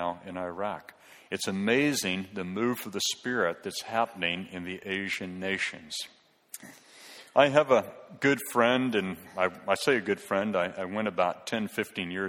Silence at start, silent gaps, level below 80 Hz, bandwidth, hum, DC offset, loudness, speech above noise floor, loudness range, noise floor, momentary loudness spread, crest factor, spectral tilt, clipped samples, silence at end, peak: 0 s; none; -70 dBFS; 17 kHz; none; under 0.1%; -29 LUFS; 22 dB; 6 LU; -51 dBFS; 13 LU; 24 dB; -4 dB/octave; under 0.1%; 0 s; -6 dBFS